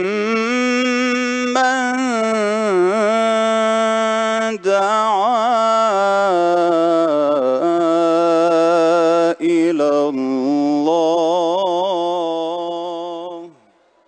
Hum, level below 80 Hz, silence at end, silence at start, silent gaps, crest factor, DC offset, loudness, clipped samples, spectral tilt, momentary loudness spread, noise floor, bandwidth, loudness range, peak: none; -72 dBFS; 0.6 s; 0 s; none; 14 dB; under 0.1%; -16 LUFS; under 0.1%; -4.5 dB/octave; 5 LU; -55 dBFS; 9.2 kHz; 3 LU; -2 dBFS